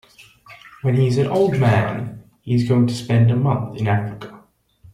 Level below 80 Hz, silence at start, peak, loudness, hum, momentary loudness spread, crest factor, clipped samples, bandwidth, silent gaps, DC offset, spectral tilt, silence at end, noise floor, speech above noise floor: -52 dBFS; 0.2 s; -4 dBFS; -19 LUFS; none; 15 LU; 14 dB; under 0.1%; 11 kHz; none; under 0.1%; -8 dB/octave; 0.55 s; -51 dBFS; 33 dB